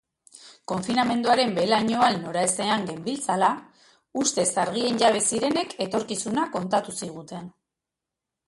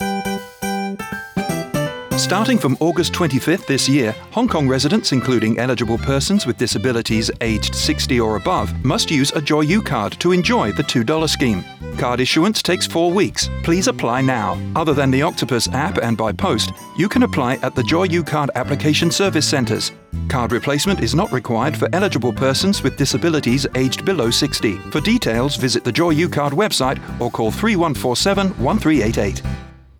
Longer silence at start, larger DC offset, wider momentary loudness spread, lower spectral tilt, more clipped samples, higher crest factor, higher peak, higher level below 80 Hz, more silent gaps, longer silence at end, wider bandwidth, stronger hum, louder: first, 0.35 s vs 0 s; neither; first, 13 LU vs 6 LU; second, -3 dB/octave vs -4.5 dB/octave; neither; first, 18 dB vs 12 dB; about the same, -8 dBFS vs -6 dBFS; second, -66 dBFS vs -36 dBFS; neither; first, 1 s vs 0.25 s; second, 11.5 kHz vs over 20 kHz; neither; second, -24 LUFS vs -18 LUFS